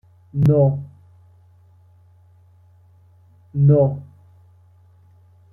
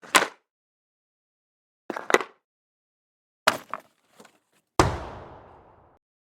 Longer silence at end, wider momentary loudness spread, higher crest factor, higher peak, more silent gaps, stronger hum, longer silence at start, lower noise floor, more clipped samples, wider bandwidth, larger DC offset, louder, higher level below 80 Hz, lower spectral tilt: first, 1.5 s vs 0.85 s; about the same, 17 LU vs 18 LU; second, 18 dB vs 30 dB; second, -4 dBFS vs 0 dBFS; second, none vs 0.51-1.89 s, 2.44-3.46 s; neither; first, 0.35 s vs 0.05 s; second, -52 dBFS vs -67 dBFS; neither; second, 2 kHz vs 17.5 kHz; neither; first, -18 LUFS vs -26 LUFS; about the same, -50 dBFS vs -48 dBFS; first, -12 dB/octave vs -3 dB/octave